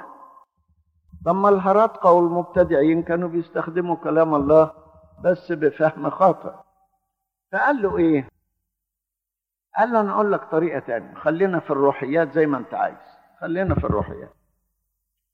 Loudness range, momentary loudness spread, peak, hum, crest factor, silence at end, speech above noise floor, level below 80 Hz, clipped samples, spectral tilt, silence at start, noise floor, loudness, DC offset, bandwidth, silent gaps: 5 LU; 11 LU; -4 dBFS; none; 18 dB; 1.1 s; 67 dB; -48 dBFS; under 0.1%; -9.5 dB/octave; 0 s; -87 dBFS; -21 LUFS; under 0.1%; 6.4 kHz; none